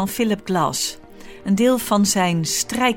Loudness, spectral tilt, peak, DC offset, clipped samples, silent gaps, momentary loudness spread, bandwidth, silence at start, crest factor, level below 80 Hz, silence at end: -19 LUFS; -4 dB/octave; -4 dBFS; under 0.1%; under 0.1%; none; 8 LU; 18 kHz; 0 s; 16 dB; -50 dBFS; 0 s